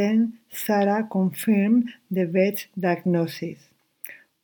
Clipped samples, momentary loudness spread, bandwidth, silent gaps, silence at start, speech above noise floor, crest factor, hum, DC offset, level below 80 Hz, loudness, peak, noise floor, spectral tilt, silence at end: under 0.1%; 15 LU; 19.5 kHz; none; 0 s; 21 dB; 16 dB; none; under 0.1%; -76 dBFS; -23 LUFS; -8 dBFS; -44 dBFS; -7 dB/octave; 0.25 s